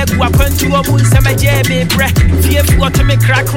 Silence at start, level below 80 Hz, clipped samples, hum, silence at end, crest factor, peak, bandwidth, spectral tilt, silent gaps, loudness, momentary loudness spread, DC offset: 0 s; -16 dBFS; under 0.1%; none; 0 s; 10 dB; 0 dBFS; 17 kHz; -5 dB/octave; none; -10 LUFS; 2 LU; under 0.1%